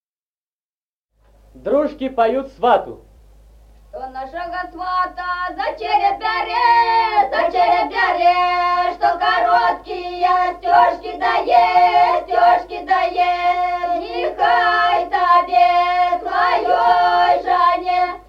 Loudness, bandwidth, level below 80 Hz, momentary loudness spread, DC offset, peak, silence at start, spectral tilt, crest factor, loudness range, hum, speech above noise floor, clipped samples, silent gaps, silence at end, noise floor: -16 LUFS; 6.8 kHz; -48 dBFS; 9 LU; under 0.1%; -2 dBFS; 1.55 s; -4 dB/octave; 16 dB; 7 LU; none; over 73 dB; under 0.1%; none; 0.1 s; under -90 dBFS